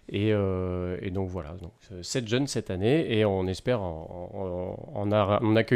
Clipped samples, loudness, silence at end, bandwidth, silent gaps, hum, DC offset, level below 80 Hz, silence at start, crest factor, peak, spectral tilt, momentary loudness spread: under 0.1%; -28 LUFS; 0 s; 13 kHz; none; none; under 0.1%; -56 dBFS; 0.1 s; 18 dB; -10 dBFS; -6 dB/octave; 14 LU